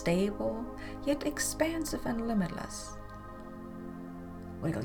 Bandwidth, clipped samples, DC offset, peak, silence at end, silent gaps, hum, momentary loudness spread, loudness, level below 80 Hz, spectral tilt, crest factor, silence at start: over 20 kHz; under 0.1%; under 0.1%; -14 dBFS; 0 s; none; none; 15 LU; -35 LUFS; -48 dBFS; -5 dB/octave; 20 dB; 0 s